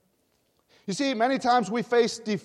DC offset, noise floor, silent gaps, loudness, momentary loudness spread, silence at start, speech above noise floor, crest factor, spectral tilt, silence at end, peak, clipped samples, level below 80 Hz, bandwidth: under 0.1%; -70 dBFS; none; -25 LUFS; 9 LU; 0.85 s; 45 dB; 16 dB; -4.5 dB/octave; 0.05 s; -10 dBFS; under 0.1%; -72 dBFS; 12 kHz